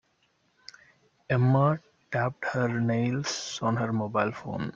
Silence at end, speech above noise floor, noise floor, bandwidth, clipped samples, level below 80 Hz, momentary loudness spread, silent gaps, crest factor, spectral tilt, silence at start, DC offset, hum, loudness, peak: 0.05 s; 43 dB; -70 dBFS; 7.6 kHz; under 0.1%; -64 dBFS; 8 LU; none; 18 dB; -6 dB/octave; 1.3 s; under 0.1%; none; -28 LUFS; -10 dBFS